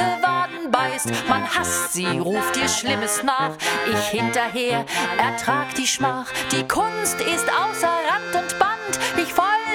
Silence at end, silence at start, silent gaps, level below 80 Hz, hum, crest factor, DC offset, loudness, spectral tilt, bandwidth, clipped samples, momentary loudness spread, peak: 0 s; 0 s; none; -54 dBFS; none; 22 dB; under 0.1%; -21 LUFS; -2.5 dB/octave; over 20 kHz; under 0.1%; 2 LU; 0 dBFS